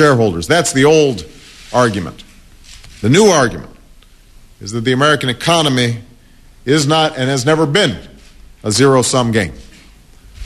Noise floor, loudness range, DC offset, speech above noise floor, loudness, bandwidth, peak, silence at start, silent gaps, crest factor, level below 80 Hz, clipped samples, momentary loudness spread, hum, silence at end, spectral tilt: -43 dBFS; 2 LU; under 0.1%; 30 dB; -13 LUFS; 13.5 kHz; 0 dBFS; 0 s; none; 14 dB; -42 dBFS; under 0.1%; 16 LU; none; 0 s; -4.5 dB/octave